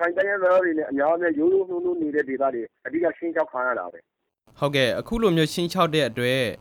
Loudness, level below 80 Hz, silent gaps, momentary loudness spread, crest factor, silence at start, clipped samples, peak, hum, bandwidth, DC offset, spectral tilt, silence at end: -23 LUFS; -50 dBFS; none; 6 LU; 16 dB; 0 s; under 0.1%; -6 dBFS; none; 18 kHz; under 0.1%; -5.5 dB/octave; 0.05 s